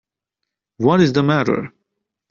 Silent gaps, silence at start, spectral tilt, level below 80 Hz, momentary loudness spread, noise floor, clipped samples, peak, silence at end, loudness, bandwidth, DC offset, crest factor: none; 0.8 s; -6 dB/octave; -56 dBFS; 9 LU; -81 dBFS; under 0.1%; -2 dBFS; 0.65 s; -17 LUFS; 7.2 kHz; under 0.1%; 16 dB